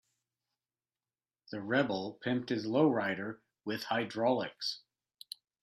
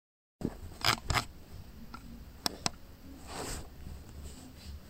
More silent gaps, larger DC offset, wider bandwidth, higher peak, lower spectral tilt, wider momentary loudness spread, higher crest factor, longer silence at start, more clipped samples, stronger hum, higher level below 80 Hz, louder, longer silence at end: neither; neither; second, 13.5 kHz vs 16 kHz; second, -16 dBFS vs -10 dBFS; first, -6 dB/octave vs -3 dB/octave; second, 17 LU vs 20 LU; second, 20 dB vs 30 dB; first, 1.5 s vs 0.4 s; neither; neither; second, -80 dBFS vs -48 dBFS; about the same, -34 LUFS vs -35 LUFS; first, 0.85 s vs 0 s